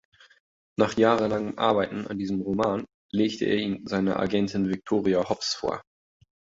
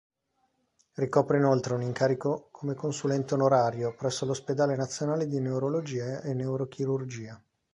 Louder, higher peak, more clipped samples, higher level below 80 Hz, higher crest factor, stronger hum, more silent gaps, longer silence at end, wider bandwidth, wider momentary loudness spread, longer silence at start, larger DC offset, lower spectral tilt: first, -26 LUFS vs -29 LUFS; about the same, -6 dBFS vs -8 dBFS; neither; first, -58 dBFS vs -68 dBFS; about the same, 20 dB vs 20 dB; neither; first, 2.94-3.09 s vs none; first, 0.75 s vs 0.35 s; second, 7.8 kHz vs 11 kHz; about the same, 9 LU vs 10 LU; second, 0.8 s vs 1 s; neither; about the same, -5.5 dB/octave vs -6.5 dB/octave